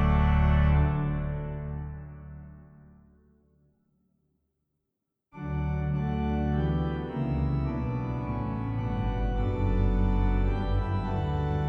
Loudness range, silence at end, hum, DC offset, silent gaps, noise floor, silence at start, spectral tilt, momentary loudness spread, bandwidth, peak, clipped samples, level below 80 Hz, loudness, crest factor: 13 LU; 0 s; none; under 0.1%; none; -83 dBFS; 0 s; -10 dB/octave; 14 LU; 4.7 kHz; -12 dBFS; under 0.1%; -32 dBFS; -29 LUFS; 16 dB